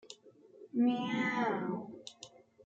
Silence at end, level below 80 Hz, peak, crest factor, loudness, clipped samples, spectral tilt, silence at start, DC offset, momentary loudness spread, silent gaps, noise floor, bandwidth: 0.4 s; -82 dBFS; -22 dBFS; 16 dB; -34 LUFS; under 0.1%; -5.5 dB/octave; 0.05 s; under 0.1%; 22 LU; none; -59 dBFS; 8 kHz